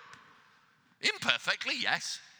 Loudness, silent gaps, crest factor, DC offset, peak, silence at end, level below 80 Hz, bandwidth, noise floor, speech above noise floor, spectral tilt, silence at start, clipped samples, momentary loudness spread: -30 LUFS; none; 30 dB; under 0.1%; -6 dBFS; 0.1 s; under -90 dBFS; over 20 kHz; -66 dBFS; 33 dB; -0.5 dB/octave; 0 s; under 0.1%; 4 LU